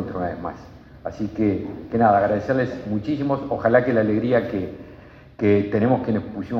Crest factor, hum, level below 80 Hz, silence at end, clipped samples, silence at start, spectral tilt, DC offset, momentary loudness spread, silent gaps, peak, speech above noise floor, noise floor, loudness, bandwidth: 18 dB; none; -50 dBFS; 0 s; under 0.1%; 0 s; -9 dB/octave; under 0.1%; 15 LU; none; -4 dBFS; 23 dB; -44 dBFS; -21 LUFS; 6.6 kHz